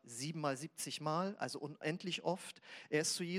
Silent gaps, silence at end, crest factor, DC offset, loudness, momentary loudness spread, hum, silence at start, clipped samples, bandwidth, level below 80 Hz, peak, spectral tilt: none; 0 s; 18 dB; under 0.1%; -40 LUFS; 8 LU; none; 0.05 s; under 0.1%; 16 kHz; under -90 dBFS; -22 dBFS; -3.5 dB/octave